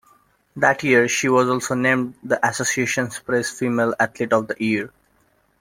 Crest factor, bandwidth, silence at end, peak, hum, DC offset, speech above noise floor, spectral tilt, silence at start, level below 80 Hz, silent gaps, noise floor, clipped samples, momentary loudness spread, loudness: 20 dB; 16.5 kHz; 0.75 s; 0 dBFS; none; under 0.1%; 42 dB; -4 dB/octave; 0.55 s; -62 dBFS; none; -62 dBFS; under 0.1%; 6 LU; -20 LUFS